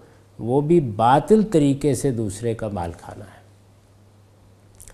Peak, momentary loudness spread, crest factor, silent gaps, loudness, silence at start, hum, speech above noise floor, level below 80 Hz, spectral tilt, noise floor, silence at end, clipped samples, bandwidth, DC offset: -2 dBFS; 16 LU; 20 dB; none; -20 LUFS; 0.4 s; none; 32 dB; -48 dBFS; -7 dB/octave; -52 dBFS; 0 s; under 0.1%; 14.5 kHz; under 0.1%